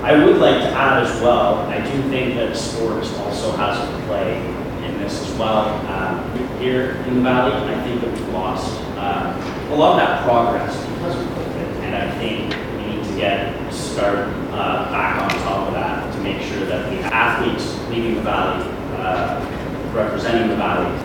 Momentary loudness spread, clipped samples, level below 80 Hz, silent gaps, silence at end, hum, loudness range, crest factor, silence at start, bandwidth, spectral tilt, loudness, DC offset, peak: 9 LU; under 0.1%; -38 dBFS; none; 0 s; none; 3 LU; 18 dB; 0 s; 19 kHz; -5.5 dB/octave; -20 LUFS; under 0.1%; 0 dBFS